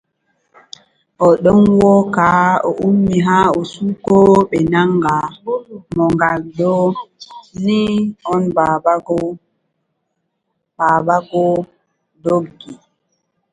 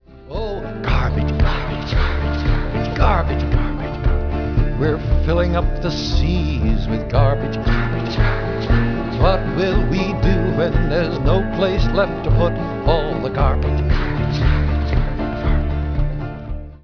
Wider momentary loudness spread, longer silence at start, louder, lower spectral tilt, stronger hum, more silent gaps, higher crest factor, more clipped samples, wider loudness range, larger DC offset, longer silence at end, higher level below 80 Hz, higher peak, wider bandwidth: first, 13 LU vs 5 LU; first, 1.2 s vs 0.1 s; first, -14 LUFS vs -20 LUFS; about the same, -7.5 dB/octave vs -8 dB/octave; neither; neither; about the same, 16 dB vs 14 dB; neither; first, 6 LU vs 2 LU; second, under 0.1% vs 0.3%; first, 0.8 s vs 0.05 s; second, -46 dBFS vs -20 dBFS; about the same, 0 dBFS vs -2 dBFS; first, 9.4 kHz vs 5.4 kHz